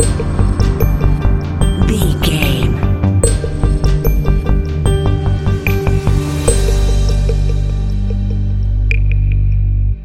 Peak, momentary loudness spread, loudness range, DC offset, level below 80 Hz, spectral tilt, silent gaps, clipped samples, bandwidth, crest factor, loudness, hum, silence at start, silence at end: 0 dBFS; 3 LU; 1 LU; under 0.1%; -16 dBFS; -6 dB/octave; none; under 0.1%; 14 kHz; 12 dB; -15 LUFS; 50 Hz at -25 dBFS; 0 s; 0 s